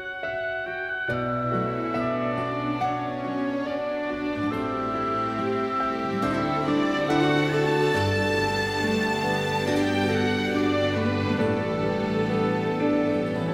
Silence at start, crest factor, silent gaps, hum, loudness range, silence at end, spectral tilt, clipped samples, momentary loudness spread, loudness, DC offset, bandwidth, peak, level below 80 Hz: 0 s; 16 dB; none; none; 4 LU; 0 s; -6 dB/octave; under 0.1%; 6 LU; -25 LUFS; under 0.1%; 16 kHz; -10 dBFS; -52 dBFS